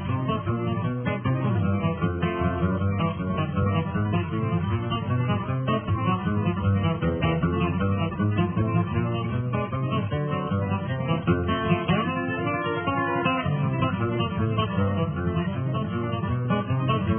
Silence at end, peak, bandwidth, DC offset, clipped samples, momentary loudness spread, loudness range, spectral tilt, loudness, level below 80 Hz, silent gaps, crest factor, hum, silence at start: 0 s; -10 dBFS; 3.5 kHz; under 0.1%; under 0.1%; 3 LU; 1 LU; -11.5 dB/octave; -26 LUFS; -44 dBFS; none; 16 dB; none; 0 s